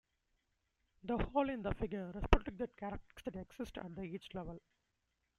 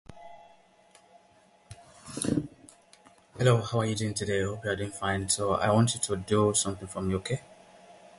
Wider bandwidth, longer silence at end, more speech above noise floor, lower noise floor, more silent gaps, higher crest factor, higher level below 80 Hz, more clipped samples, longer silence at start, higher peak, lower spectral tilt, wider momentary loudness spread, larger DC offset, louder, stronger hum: about the same, 12 kHz vs 11.5 kHz; first, 0.8 s vs 0.25 s; first, 45 dB vs 34 dB; first, -84 dBFS vs -61 dBFS; neither; first, 32 dB vs 20 dB; first, -46 dBFS vs -54 dBFS; neither; first, 1.05 s vs 0.1 s; about the same, -8 dBFS vs -10 dBFS; first, -7 dB/octave vs -4.5 dB/octave; about the same, 12 LU vs 11 LU; neither; second, -41 LUFS vs -28 LUFS; neither